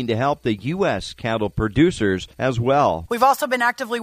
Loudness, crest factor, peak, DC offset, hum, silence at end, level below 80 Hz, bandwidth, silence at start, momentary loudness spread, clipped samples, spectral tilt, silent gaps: -20 LUFS; 16 dB; -4 dBFS; under 0.1%; none; 0 s; -42 dBFS; 15.5 kHz; 0 s; 6 LU; under 0.1%; -6 dB/octave; none